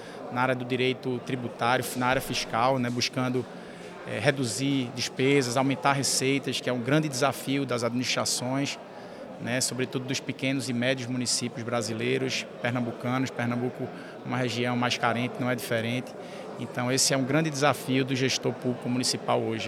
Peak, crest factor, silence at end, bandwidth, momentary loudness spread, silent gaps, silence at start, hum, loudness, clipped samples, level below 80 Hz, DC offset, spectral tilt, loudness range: -6 dBFS; 22 dB; 0 s; 16.5 kHz; 10 LU; none; 0 s; none; -27 LUFS; under 0.1%; -64 dBFS; under 0.1%; -4 dB/octave; 3 LU